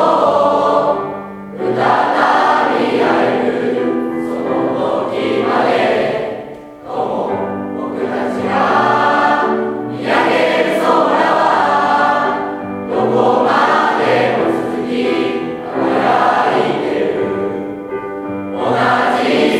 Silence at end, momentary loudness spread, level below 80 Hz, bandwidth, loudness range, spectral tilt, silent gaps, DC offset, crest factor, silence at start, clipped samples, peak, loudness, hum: 0 s; 10 LU; -56 dBFS; 13.5 kHz; 4 LU; -5.5 dB/octave; none; under 0.1%; 14 dB; 0 s; under 0.1%; 0 dBFS; -15 LUFS; none